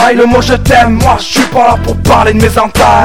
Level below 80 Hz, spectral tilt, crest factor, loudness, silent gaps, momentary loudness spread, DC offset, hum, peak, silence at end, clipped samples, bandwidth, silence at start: -20 dBFS; -5 dB/octave; 8 dB; -7 LUFS; none; 3 LU; 5%; none; 0 dBFS; 0 s; 2%; 17 kHz; 0 s